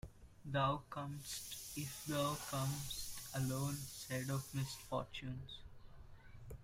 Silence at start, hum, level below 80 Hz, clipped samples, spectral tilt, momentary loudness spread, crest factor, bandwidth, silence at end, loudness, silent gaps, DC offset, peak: 0.05 s; none; -60 dBFS; under 0.1%; -4.5 dB/octave; 19 LU; 18 dB; 16 kHz; 0 s; -43 LUFS; none; under 0.1%; -26 dBFS